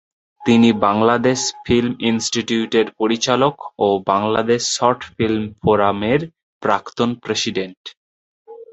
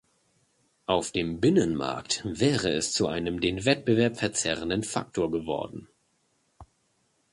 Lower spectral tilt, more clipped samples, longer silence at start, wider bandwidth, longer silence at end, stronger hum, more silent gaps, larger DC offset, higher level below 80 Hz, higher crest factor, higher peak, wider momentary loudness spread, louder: about the same, -4.5 dB/octave vs -4.5 dB/octave; neither; second, 0.4 s vs 0.9 s; second, 8.2 kHz vs 11.5 kHz; second, 0.1 s vs 0.7 s; neither; first, 6.43-6.61 s, 7.77-7.85 s, 7.97-8.45 s vs none; neither; first, -48 dBFS vs -54 dBFS; about the same, 18 dB vs 22 dB; first, 0 dBFS vs -6 dBFS; about the same, 7 LU vs 8 LU; first, -18 LUFS vs -27 LUFS